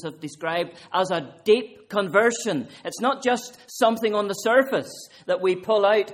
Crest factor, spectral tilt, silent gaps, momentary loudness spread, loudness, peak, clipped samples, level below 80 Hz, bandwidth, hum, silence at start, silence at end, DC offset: 18 dB; -4 dB/octave; none; 10 LU; -23 LUFS; -6 dBFS; under 0.1%; -70 dBFS; 16 kHz; none; 0 s; 0 s; under 0.1%